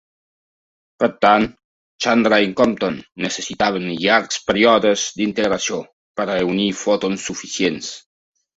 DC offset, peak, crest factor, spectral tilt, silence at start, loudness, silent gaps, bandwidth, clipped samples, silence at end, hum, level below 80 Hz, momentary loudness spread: under 0.1%; -2 dBFS; 18 dB; -3.5 dB/octave; 1 s; -18 LUFS; 1.64-1.99 s, 5.93-6.15 s; 8 kHz; under 0.1%; 0.55 s; none; -54 dBFS; 11 LU